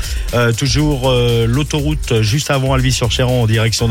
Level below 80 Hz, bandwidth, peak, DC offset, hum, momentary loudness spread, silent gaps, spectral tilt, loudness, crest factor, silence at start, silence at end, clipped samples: -24 dBFS; 16.5 kHz; -4 dBFS; under 0.1%; none; 3 LU; none; -5 dB/octave; -15 LUFS; 10 dB; 0 s; 0 s; under 0.1%